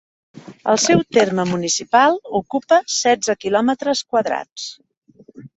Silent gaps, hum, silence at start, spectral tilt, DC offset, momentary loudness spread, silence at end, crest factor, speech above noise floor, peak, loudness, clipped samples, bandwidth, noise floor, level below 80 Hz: 4.52-4.56 s, 4.97-5.02 s; none; 0.35 s; -3.5 dB/octave; under 0.1%; 10 LU; 0.1 s; 16 dB; 25 dB; -2 dBFS; -18 LUFS; under 0.1%; 8.4 kHz; -42 dBFS; -60 dBFS